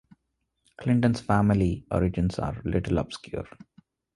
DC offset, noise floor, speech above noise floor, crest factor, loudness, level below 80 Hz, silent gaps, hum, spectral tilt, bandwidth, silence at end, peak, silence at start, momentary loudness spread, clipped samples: under 0.1%; -78 dBFS; 53 dB; 20 dB; -26 LUFS; -42 dBFS; none; none; -8 dB/octave; 11.5 kHz; 0.7 s; -8 dBFS; 0.8 s; 13 LU; under 0.1%